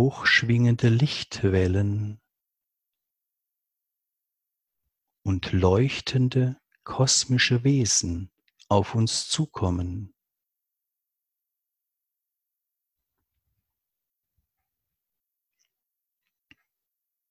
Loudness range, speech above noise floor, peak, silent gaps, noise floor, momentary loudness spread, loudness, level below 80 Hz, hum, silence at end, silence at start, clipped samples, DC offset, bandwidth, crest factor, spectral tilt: 13 LU; 62 dB; -6 dBFS; none; -85 dBFS; 14 LU; -23 LUFS; -44 dBFS; none; 7.25 s; 0 s; under 0.1%; under 0.1%; 11.5 kHz; 22 dB; -4.5 dB/octave